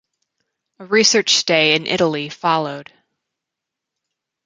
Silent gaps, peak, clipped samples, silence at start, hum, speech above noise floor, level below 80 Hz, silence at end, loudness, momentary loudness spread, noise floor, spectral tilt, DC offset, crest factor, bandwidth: none; 0 dBFS; under 0.1%; 0.8 s; none; 66 dB; -64 dBFS; 1.65 s; -16 LUFS; 9 LU; -83 dBFS; -2.5 dB/octave; under 0.1%; 20 dB; 9.6 kHz